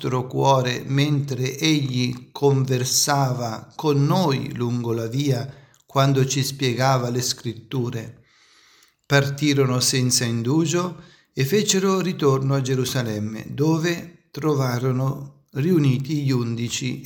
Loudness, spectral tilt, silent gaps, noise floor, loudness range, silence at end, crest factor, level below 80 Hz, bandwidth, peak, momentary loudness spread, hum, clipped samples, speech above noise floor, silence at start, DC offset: -22 LUFS; -5 dB/octave; none; -56 dBFS; 3 LU; 0 s; 18 dB; -60 dBFS; 18 kHz; -4 dBFS; 9 LU; none; under 0.1%; 35 dB; 0 s; under 0.1%